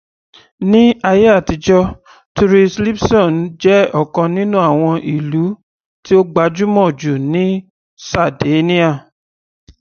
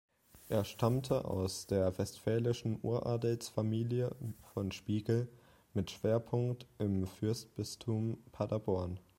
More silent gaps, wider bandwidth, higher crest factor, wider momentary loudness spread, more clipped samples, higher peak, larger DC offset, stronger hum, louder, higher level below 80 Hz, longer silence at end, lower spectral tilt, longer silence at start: first, 2.26-2.35 s, 5.63-6.03 s, 7.70-7.97 s vs none; second, 6.8 kHz vs 16.5 kHz; second, 14 dB vs 20 dB; first, 10 LU vs 7 LU; neither; first, 0 dBFS vs -16 dBFS; neither; neither; first, -13 LUFS vs -37 LUFS; first, -40 dBFS vs -62 dBFS; first, 0.8 s vs 0.2 s; about the same, -7 dB/octave vs -7 dB/octave; first, 0.6 s vs 0.35 s